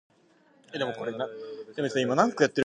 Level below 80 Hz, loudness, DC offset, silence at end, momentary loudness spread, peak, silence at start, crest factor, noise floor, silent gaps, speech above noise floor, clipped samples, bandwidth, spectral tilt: -78 dBFS; -28 LUFS; under 0.1%; 0 s; 16 LU; -6 dBFS; 0.7 s; 24 dB; -62 dBFS; none; 35 dB; under 0.1%; 9.8 kHz; -5 dB/octave